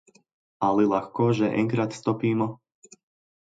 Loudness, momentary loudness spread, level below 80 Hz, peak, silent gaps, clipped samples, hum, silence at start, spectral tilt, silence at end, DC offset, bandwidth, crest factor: -25 LUFS; 5 LU; -64 dBFS; -8 dBFS; none; under 0.1%; none; 0.6 s; -7.5 dB/octave; 0.9 s; under 0.1%; 9.2 kHz; 18 dB